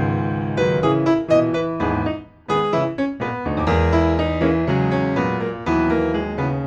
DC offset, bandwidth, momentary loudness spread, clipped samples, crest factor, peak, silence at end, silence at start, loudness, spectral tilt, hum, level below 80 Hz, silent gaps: under 0.1%; 8 kHz; 6 LU; under 0.1%; 16 dB; -4 dBFS; 0 s; 0 s; -20 LUFS; -8 dB/octave; none; -34 dBFS; none